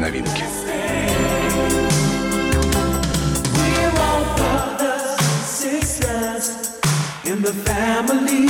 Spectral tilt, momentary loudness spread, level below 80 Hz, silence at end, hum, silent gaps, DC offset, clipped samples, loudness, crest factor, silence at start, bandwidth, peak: -4.5 dB/octave; 5 LU; -30 dBFS; 0 s; none; none; under 0.1%; under 0.1%; -19 LUFS; 12 dB; 0 s; 17 kHz; -6 dBFS